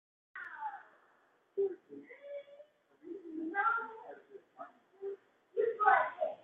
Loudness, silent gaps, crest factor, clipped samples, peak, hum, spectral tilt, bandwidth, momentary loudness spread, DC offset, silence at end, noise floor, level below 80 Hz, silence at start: -35 LUFS; none; 26 dB; under 0.1%; -12 dBFS; none; -1.5 dB/octave; 4.1 kHz; 24 LU; under 0.1%; 0.05 s; -71 dBFS; -90 dBFS; 0.35 s